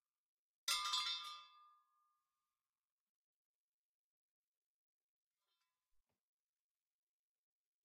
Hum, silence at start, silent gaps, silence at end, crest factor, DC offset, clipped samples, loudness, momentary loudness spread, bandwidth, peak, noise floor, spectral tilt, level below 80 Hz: none; 0.65 s; none; 6.2 s; 28 dB; under 0.1%; under 0.1%; -41 LUFS; 15 LU; 15.5 kHz; -24 dBFS; under -90 dBFS; 4.5 dB/octave; under -90 dBFS